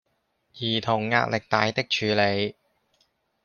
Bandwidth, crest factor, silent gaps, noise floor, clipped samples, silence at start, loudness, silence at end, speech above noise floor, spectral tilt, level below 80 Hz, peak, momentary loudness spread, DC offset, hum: 7 kHz; 24 dB; none; -73 dBFS; under 0.1%; 0.55 s; -24 LUFS; 0.95 s; 49 dB; -5 dB/octave; -64 dBFS; -4 dBFS; 6 LU; under 0.1%; none